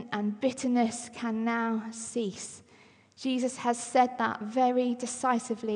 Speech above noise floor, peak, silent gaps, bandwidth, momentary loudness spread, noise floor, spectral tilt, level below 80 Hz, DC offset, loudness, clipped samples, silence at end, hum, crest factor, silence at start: 29 dB; -12 dBFS; none; 11 kHz; 9 LU; -59 dBFS; -4 dB/octave; -78 dBFS; under 0.1%; -30 LUFS; under 0.1%; 0 s; none; 16 dB; 0 s